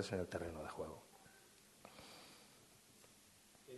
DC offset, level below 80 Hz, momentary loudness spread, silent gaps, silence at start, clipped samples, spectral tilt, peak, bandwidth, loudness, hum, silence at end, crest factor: under 0.1%; -74 dBFS; 19 LU; none; 0 s; under 0.1%; -5 dB/octave; -28 dBFS; 12 kHz; -50 LUFS; none; 0 s; 24 dB